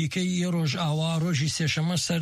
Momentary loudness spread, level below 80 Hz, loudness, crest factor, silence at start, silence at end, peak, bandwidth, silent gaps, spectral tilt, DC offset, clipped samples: 1 LU; -60 dBFS; -26 LUFS; 10 dB; 0 s; 0 s; -16 dBFS; 14 kHz; none; -5 dB/octave; under 0.1%; under 0.1%